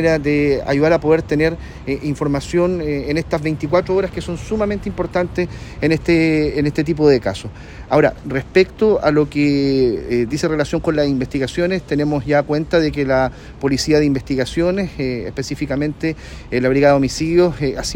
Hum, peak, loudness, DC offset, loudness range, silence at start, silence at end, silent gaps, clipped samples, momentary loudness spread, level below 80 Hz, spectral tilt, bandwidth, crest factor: none; 0 dBFS; -18 LUFS; under 0.1%; 3 LU; 0 s; 0 s; none; under 0.1%; 9 LU; -36 dBFS; -6.5 dB/octave; 16 kHz; 16 dB